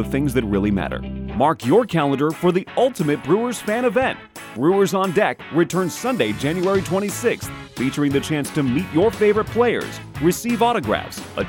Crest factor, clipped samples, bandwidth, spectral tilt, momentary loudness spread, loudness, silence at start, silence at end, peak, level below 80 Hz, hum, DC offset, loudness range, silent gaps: 14 dB; under 0.1%; 19 kHz; -5.5 dB/octave; 7 LU; -20 LUFS; 0 s; 0 s; -6 dBFS; -42 dBFS; none; under 0.1%; 2 LU; none